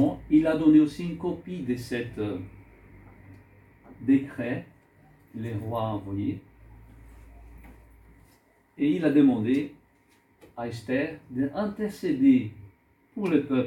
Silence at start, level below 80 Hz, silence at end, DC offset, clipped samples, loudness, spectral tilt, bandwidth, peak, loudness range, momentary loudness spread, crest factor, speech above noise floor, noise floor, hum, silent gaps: 0 s; -56 dBFS; 0 s; under 0.1%; under 0.1%; -26 LUFS; -8 dB/octave; 12.5 kHz; -8 dBFS; 9 LU; 17 LU; 18 dB; 38 dB; -63 dBFS; none; none